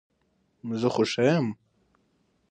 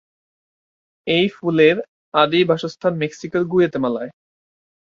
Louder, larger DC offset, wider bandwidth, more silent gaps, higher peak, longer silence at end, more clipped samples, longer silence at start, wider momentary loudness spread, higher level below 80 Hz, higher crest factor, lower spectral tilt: second, -26 LUFS vs -19 LUFS; neither; first, 9.4 kHz vs 7.4 kHz; second, none vs 1.88-2.12 s; second, -8 dBFS vs -2 dBFS; about the same, 0.95 s vs 0.85 s; neither; second, 0.65 s vs 1.05 s; first, 17 LU vs 10 LU; second, -68 dBFS vs -62 dBFS; about the same, 20 dB vs 18 dB; about the same, -6 dB/octave vs -6.5 dB/octave